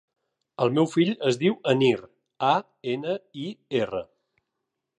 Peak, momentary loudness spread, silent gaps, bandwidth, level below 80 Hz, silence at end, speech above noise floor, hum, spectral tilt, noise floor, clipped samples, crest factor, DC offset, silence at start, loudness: -8 dBFS; 11 LU; none; 10.5 kHz; -68 dBFS; 0.95 s; 58 dB; none; -6 dB/octave; -82 dBFS; under 0.1%; 18 dB; under 0.1%; 0.6 s; -25 LUFS